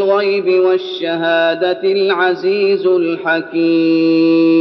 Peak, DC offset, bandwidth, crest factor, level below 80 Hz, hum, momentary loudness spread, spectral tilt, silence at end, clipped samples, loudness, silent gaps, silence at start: -2 dBFS; under 0.1%; 6 kHz; 10 dB; -68 dBFS; none; 5 LU; -3 dB/octave; 0 s; under 0.1%; -14 LUFS; none; 0 s